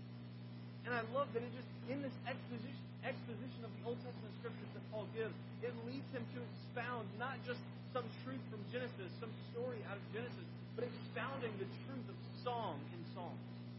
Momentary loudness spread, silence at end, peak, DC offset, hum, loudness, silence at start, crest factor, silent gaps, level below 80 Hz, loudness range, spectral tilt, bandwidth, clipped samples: 7 LU; 0 s; -28 dBFS; under 0.1%; 60 Hz at -50 dBFS; -47 LUFS; 0 s; 20 dB; none; -76 dBFS; 2 LU; -5.5 dB/octave; 5.6 kHz; under 0.1%